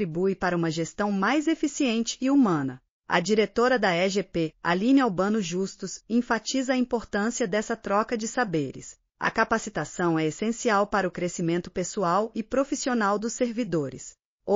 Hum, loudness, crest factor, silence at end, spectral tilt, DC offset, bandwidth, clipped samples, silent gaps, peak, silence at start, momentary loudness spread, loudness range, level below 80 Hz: none; -26 LUFS; 18 dB; 0 s; -4.5 dB/octave; under 0.1%; 7.4 kHz; under 0.1%; 2.89-3.01 s, 14.25-14.40 s; -8 dBFS; 0 s; 8 LU; 3 LU; -56 dBFS